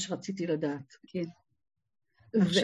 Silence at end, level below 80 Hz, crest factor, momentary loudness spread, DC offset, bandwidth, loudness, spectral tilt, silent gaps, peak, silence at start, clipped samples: 0 s; -70 dBFS; 20 dB; 12 LU; under 0.1%; 11.5 kHz; -33 LUFS; -5 dB/octave; none; -12 dBFS; 0 s; under 0.1%